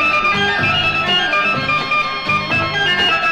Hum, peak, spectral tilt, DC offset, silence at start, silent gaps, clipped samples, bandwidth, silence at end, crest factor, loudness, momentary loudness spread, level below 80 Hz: none; -6 dBFS; -3.5 dB/octave; under 0.1%; 0 s; none; under 0.1%; 15 kHz; 0 s; 10 dB; -14 LUFS; 3 LU; -44 dBFS